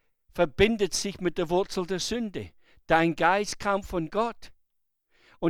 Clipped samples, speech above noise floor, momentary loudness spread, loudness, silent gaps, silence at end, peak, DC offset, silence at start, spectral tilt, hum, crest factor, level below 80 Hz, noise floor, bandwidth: under 0.1%; 48 dB; 9 LU; -27 LUFS; none; 0 s; -6 dBFS; under 0.1%; 0.35 s; -4.5 dB/octave; none; 22 dB; -48 dBFS; -74 dBFS; 16 kHz